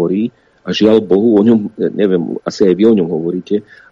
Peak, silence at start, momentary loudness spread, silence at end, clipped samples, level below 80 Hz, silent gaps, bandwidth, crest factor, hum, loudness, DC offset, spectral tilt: 0 dBFS; 0 s; 11 LU; 0.3 s; under 0.1%; -56 dBFS; none; 7.6 kHz; 12 dB; none; -13 LUFS; under 0.1%; -7 dB/octave